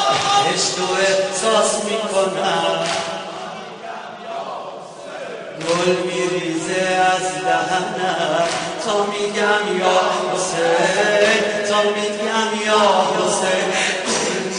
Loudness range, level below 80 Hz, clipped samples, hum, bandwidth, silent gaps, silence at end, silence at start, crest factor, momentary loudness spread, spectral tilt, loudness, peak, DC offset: 7 LU; -60 dBFS; under 0.1%; none; 10.5 kHz; none; 0 s; 0 s; 16 dB; 14 LU; -2.5 dB/octave; -18 LUFS; -2 dBFS; under 0.1%